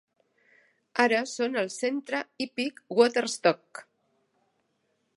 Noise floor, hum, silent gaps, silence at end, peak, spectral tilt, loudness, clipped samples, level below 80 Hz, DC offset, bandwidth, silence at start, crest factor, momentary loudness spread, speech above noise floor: -75 dBFS; none; none; 1.35 s; -6 dBFS; -3 dB/octave; -27 LUFS; under 0.1%; -82 dBFS; under 0.1%; 11.5 kHz; 0.95 s; 22 dB; 10 LU; 48 dB